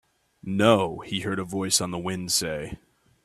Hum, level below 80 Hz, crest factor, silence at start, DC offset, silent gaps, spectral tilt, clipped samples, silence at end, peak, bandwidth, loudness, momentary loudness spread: none; -56 dBFS; 22 dB; 0.45 s; under 0.1%; none; -3.5 dB/octave; under 0.1%; 0.5 s; -4 dBFS; 15.5 kHz; -25 LUFS; 16 LU